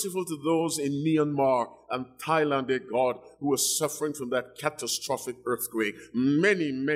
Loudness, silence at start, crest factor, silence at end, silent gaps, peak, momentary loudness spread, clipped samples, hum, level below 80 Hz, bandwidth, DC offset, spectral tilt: -27 LUFS; 0 s; 16 dB; 0 s; none; -10 dBFS; 8 LU; under 0.1%; none; -72 dBFS; 16 kHz; under 0.1%; -4 dB/octave